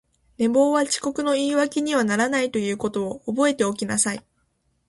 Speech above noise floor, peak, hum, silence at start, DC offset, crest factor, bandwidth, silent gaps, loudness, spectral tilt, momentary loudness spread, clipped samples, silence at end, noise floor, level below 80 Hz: 47 dB; -8 dBFS; none; 0.4 s; under 0.1%; 16 dB; 11.5 kHz; none; -22 LUFS; -3.5 dB/octave; 6 LU; under 0.1%; 0.7 s; -69 dBFS; -62 dBFS